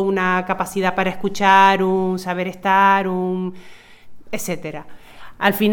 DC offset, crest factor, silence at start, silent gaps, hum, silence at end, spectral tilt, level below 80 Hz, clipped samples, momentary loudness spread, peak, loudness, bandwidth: under 0.1%; 18 dB; 0 s; none; none; 0 s; -5 dB/octave; -52 dBFS; under 0.1%; 15 LU; 0 dBFS; -18 LUFS; 19 kHz